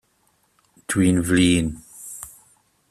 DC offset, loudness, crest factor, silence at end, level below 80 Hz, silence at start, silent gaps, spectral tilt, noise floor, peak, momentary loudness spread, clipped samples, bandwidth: under 0.1%; -20 LUFS; 18 dB; 0.6 s; -46 dBFS; 0.9 s; none; -5 dB/octave; -65 dBFS; -6 dBFS; 21 LU; under 0.1%; 14 kHz